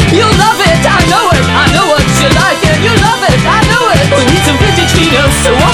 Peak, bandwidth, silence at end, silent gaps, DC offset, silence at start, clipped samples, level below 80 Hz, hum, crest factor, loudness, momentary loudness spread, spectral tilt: 0 dBFS; over 20 kHz; 0 s; none; under 0.1%; 0 s; 1%; -20 dBFS; none; 8 dB; -7 LUFS; 1 LU; -4.5 dB/octave